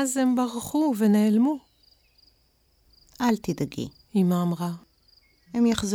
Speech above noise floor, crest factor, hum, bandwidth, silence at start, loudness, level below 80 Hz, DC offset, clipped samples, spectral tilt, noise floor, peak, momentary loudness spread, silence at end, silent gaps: 42 dB; 18 dB; none; 18 kHz; 0 s; -25 LUFS; -58 dBFS; under 0.1%; under 0.1%; -6 dB/octave; -65 dBFS; -8 dBFS; 12 LU; 0 s; none